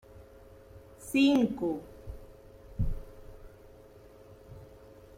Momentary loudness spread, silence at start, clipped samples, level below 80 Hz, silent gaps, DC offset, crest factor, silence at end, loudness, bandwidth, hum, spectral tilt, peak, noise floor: 29 LU; 0.15 s; under 0.1%; -46 dBFS; none; under 0.1%; 20 dB; 0.5 s; -29 LUFS; 16 kHz; none; -6 dB/octave; -14 dBFS; -54 dBFS